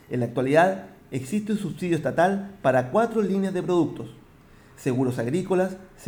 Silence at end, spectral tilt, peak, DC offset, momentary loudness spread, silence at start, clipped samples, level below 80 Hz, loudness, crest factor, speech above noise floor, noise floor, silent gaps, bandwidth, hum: 0 s; -7 dB/octave; -6 dBFS; under 0.1%; 10 LU; 0.1 s; under 0.1%; -58 dBFS; -24 LUFS; 18 dB; 28 dB; -51 dBFS; none; over 20 kHz; none